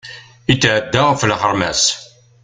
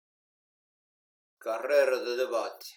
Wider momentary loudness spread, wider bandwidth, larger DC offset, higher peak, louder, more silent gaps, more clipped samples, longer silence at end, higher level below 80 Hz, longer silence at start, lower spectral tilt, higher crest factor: about the same, 11 LU vs 11 LU; second, 9.6 kHz vs 19 kHz; neither; first, 0 dBFS vs -12 dBFS; first, -15 LUFS vs -29 LUFS; neither; neither; first, 0.4 s vs 0.05 s; first, -44 dBFS vs under -90 dBFS; second, 0.05 s vs 1.4 s; first, -3.5 dB/octave vs -1 dB/octave; about the same, 16 dB vs 20 dB